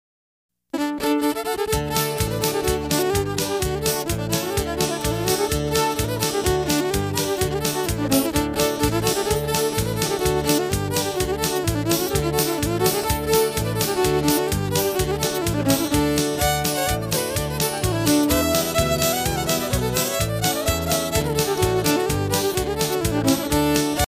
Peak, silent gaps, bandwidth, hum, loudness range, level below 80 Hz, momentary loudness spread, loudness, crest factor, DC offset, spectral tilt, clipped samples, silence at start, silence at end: -4 dBFS; none; 16 kHz; none; 2 LU; -36 dBFS; 3 LU; -21 LUFS; 18 dB; under 0.1%; -4 dB/octave; under 0.1%; 0.75 s; 0 s